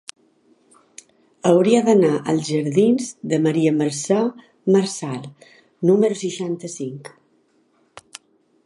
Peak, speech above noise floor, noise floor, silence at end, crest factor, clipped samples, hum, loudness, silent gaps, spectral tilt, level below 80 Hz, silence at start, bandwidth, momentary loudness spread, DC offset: -2 dBFS; 43 dB; -62 dBFS; 1.6 s; 18 dB; under 0.1%; none; -19 LUFS; none; -6 dB/octave; -70 dBFS; 1.45 s; 11.5 kHz; 17 LU; under 0.1%